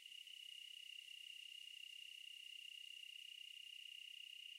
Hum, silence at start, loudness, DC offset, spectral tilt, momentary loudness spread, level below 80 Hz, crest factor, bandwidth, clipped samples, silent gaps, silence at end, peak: none; 0 s; -54 LUFS; under 0.1%; 6 dB/octave; 1 LU; under -90 dBFS; 14 dB; 16 kHz; under 0.1%; none; 0 s; -44 dBFS